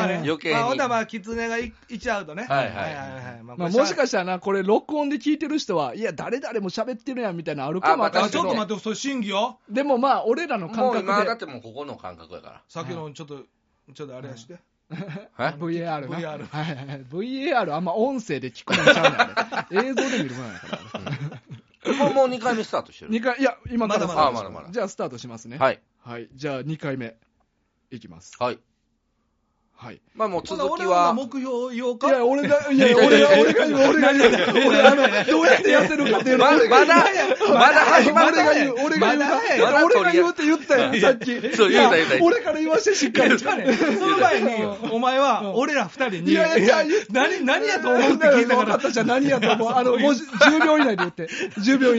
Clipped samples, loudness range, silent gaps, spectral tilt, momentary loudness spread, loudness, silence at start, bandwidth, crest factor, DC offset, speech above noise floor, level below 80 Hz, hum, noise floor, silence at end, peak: under 0.1%; 16 LU; none; -2.5 dB/octave; 18 LU; -20 LUFS; 0 s; 8 kHz; 20 dB; under 0.1%; 50 dB; -62 dBFS; none; -70 dBFS; 0 s; 0 dBFS